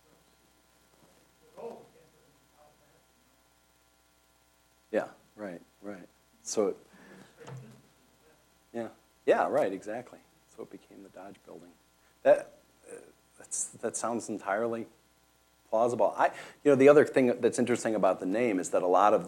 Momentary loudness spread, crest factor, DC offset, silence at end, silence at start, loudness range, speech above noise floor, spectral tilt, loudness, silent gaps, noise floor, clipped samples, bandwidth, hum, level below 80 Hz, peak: 25 LU; 24 dB; under 0.1%; 0 s; 1.55 s; 16 LU; 39 dB; -5 dB/octave; -28 LUFS; none; -66 dBFS; under 0.1%; 17 kHz; none; -76 dBFS; -8 dBFS